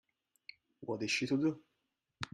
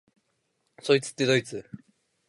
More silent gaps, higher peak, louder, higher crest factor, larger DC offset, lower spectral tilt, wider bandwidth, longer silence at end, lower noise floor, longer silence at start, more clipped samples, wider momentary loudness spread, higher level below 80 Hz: neither; second, -16 dBFS vs -8 dBFS; second, -36 LUFS vs -25 LUFS; about the same, 22 dB vs 22 dB; neither; about the same, -4.5 dB/octave vs -4.5 dB/octave; about the same, 12.5 kHz vs 11.5 kHz; second, 0.05 s vs 0.5 s; first, -84 dBFS vs -75 dBFS; about the same, 0.8 s vs 0.85 s; neither; first, 22 LU vs 16 LU; about the same, -74 dBFS vs -72 dBFS